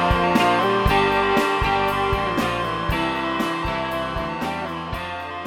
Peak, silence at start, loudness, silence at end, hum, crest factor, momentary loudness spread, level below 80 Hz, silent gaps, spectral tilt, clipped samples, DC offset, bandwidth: -4 dBFS; 0 s; -21 LUFS; 0 s; none; 18 dB; 10 LU; -34 dBFS; none; -5.5 dB/octave; under 0.1%; under 0.1%; 18.5 kHz